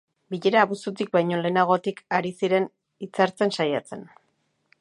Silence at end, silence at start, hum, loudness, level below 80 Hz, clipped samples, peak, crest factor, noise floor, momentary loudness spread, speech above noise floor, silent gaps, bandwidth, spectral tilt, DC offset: 0.75 s; 0.3 s; none; -24 LUFS; -76 dBFS; under 0.1%; -4 dBFS; 20 dB; -71 dBFS; 13 LU; 47 dB; none; 11.5 kHz; -6 dB/octave; under 0.1%